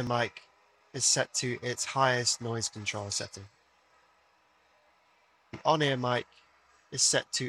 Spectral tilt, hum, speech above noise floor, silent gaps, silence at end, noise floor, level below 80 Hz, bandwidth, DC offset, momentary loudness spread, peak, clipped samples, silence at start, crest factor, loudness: -2.5 dB/octave; none; 37 dB; none; 0 s; -67 dBFS; -70 dBFS; 14.5 kHz; under 0.1%; 12 LU; -12 dBFS; under 0.1%; 0 s; 22 dB; -29 LUFS